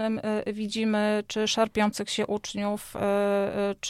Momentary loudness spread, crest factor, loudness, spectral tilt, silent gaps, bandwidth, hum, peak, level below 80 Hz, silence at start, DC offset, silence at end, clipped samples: 5 LU; 16 dB; -27 LUFS; -4 dB/octave; none; 15.5 kHz; none; -12 dBFS; -58 dBFS; 0 s; under 0.1%; 0 s; under 0.1%